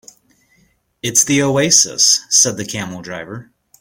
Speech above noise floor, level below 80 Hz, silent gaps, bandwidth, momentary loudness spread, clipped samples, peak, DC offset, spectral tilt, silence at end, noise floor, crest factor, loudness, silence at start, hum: 42 dB; -56 dBFS; none; 17 kHz; 18 LU; under 0.1%; 0 dBFS; under 0.1%; -2 dB/octave; 0.4 s; -58 dBFS; 18 dB; -12 LUFS; 1.05 s; none